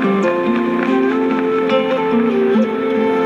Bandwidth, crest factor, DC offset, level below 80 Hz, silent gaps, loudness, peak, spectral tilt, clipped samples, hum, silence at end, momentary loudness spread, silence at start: 7.8 kHz; 10 dB; under 0.1%; -58 dBFS; none; -16 LUFS; -4 dBFS; -7 dB/octave; under 0.1%; none; 0 s; 2 LU; 0 s